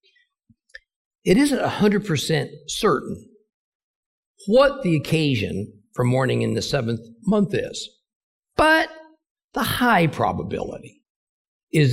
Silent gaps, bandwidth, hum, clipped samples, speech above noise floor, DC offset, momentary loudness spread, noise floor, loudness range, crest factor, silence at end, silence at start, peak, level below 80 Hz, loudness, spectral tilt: 3.54-4.35 s, 8.15-8.43 s, 9.31-9.35 s, 9.44-9.48 s, 11.10-11.67 s; 16 kHz; none; under 0.1%; 43 dB; under 0.1%; 15 LU; -63 dBFS; 2 LU; 18 dB; 0 s; 1.25 s; -6 dBFS; -50 dBFS; -21 LUFS; -5.5 dB/octave